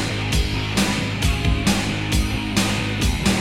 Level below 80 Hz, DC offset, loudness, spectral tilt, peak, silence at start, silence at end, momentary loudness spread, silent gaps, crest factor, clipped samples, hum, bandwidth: -26 dBFS; under 0.1%; -21 LUFS; -4.5 dB/octave; -4 dBFS; 0 s; 0 s; 2 LU; none; 16 dB; under 0.1%; none; 16.5 kHz